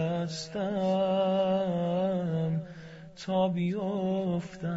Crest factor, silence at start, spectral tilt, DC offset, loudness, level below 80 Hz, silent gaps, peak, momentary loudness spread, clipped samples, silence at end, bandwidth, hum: 12 dB; 0 s; -7 dB/octave; under 0.1%; -30 LUFS; -64 dBFS; none; -18 dBFS; 8 LU; under 0.1%; 0 s; 8 kHz; none